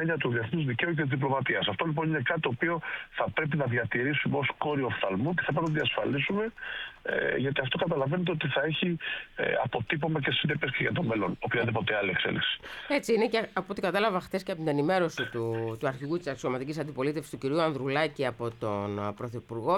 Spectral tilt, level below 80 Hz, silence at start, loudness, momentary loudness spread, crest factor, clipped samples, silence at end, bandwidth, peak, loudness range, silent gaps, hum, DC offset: -6.5 dB/octave; -60 dBFS; 0 s; -29 LUFS; 6 LU; 16 dB; under 0.1%; 0 s; 14 kHz; -14 dBFS; 3 LU; none; none; under 0.1%